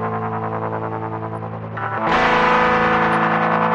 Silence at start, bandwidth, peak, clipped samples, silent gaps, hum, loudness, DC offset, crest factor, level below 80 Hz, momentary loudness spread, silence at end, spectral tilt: 0 s; 10.5 kHz; -4 dBFS; under 0.1%; none; none; -19 LUFS; under 0.1%; 14 dB; -46 dBFS; 12 LU; 0 s; -6.5 dB/octave